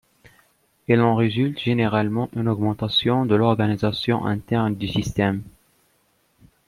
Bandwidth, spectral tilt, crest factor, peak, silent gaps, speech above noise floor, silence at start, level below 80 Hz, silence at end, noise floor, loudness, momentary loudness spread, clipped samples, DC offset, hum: 13.5 kHz; -7 dB/octave; 18 dB; -4 dBFS; none; 44 dB; 0.9 s; -50 dBFS; 1.2 s; -64 dBFS; -21 LUFS; 6 LU; under 0.1%; under 0.1%; none